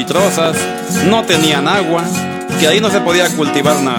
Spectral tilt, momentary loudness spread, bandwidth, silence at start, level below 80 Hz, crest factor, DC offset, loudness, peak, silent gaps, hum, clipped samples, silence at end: -4 dB/octave; 7 LU; 18 kHz; 0 s; -52 dBFS; 12 dB; under 0.1%; -13 LUFS; 0 dBFS; none; none; under 0.1%; 0 s